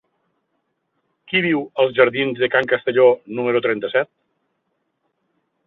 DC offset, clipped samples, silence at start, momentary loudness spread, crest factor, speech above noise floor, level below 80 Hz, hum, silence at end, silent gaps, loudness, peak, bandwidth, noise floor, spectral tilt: under 0.1%; under 0.1%; 1.3 s; 7 LU; 20 dB; 54 dB; -66 dBFS; none; 1.6 s; none; -18 LUFS; -2 dBFS; 4.2 kHz; -72 dBFS; -7.5 dB/octave